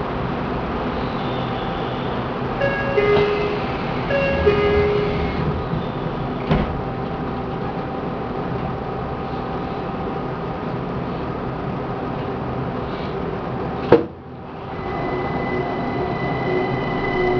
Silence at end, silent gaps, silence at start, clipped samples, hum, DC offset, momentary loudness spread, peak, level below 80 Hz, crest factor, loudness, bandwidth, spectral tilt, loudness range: 0 s; none; 0 s; under 0.1%; none; under 0.1%; 9 LU; 0 dBFS; -36 dBFS; 22 dB; -23 LUFS; 5.4 kHz; -8.5 dB/octave; 6 LU